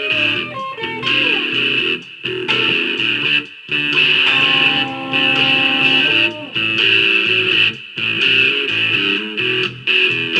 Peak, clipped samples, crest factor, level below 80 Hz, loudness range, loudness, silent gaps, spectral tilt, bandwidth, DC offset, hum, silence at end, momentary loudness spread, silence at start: 0 dBFS; under 0.1%; 16 dB; -60 dBFS; 3 LU; -13 LUFS; none; -3.5 dB/octave; 12 kHz; under 0.1%; none; 0 s; 8 LU; 0 s